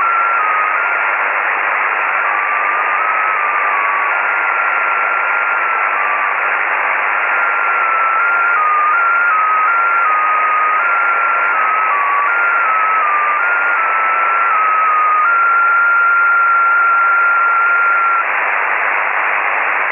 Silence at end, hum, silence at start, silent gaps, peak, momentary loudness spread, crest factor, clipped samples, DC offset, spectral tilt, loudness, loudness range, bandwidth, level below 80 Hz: 0 s; none; 0 s; none; -4 dBFS; 3 LU; 10 dB; under 0.1%; under 0.1%; -3.5 dB/octave; -12 LUFS; 3 LU; 3.7 kHz; -74 dBFS